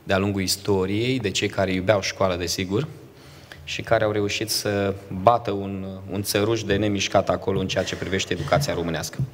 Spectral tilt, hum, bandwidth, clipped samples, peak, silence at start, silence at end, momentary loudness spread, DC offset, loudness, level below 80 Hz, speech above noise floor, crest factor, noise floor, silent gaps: -4.5 dB/octave; none; 16 kHz; under 0.1%; 0 dBFS; 0.05 s; 0 s; 8 LU; under 0.1%; -23 LUFS; -50 dBFS; 22 dB; 24 dB; -45 dBFS; none